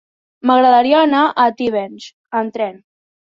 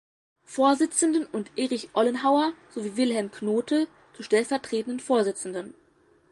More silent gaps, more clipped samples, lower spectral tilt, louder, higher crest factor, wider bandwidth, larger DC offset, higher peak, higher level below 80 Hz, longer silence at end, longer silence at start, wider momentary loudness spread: first, 2.13-2.24 s vs none; neither; first, -5 dB/octave vs -3.5 dB/octave; first, -15 LUFS vs -26 LUFS; about the same, 14 dB vs 18 dB; second, 7.4 kHz vs 11.5 kHz; neither; first, -2 dBFS vs -8 dBFS; first, -62 dBFS vs -72 dBFS; about the same, 0.6 s vs 0.6 s; about the same, 0.45 s vs 0.5 s; about the same, 13 LU vs 12 LU